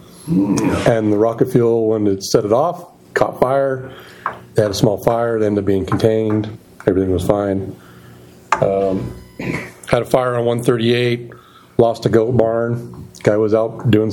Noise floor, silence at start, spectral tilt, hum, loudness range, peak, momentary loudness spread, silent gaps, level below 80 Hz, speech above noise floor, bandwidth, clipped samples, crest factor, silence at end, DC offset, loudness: -41 dBFS; 0.2 s; -6.5 dB/octave; none; 4 LU; 0 dBFS; 11 LU; none; -44 dBFS; 25 dB; 17.5 kHz; under 0.1%; 16 dB; 0 s; under 0.1%; -17 LUFS